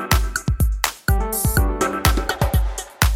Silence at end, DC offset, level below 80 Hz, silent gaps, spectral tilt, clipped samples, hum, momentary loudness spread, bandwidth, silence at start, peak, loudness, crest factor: 0 s; under 0.1%; -22 dBFS; none; -4 dB/octave; under 0.1%; none; 3 LU; 17 kHz; 0 s; 0 dBFS; -21 LUFS; 18 dB